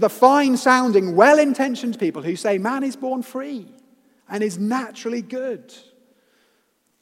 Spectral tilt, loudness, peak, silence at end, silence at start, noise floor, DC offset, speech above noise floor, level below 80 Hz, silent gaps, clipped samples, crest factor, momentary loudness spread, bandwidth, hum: -5 dB/octave; -19 LUFS; 0 dBFS; 1.45 s; 0 s; -66 dBFS; under 0.1%; 47 dB; -78 dBFS; none; under 0.1%; 20 dB; 16 LU; 16.5 kHz; none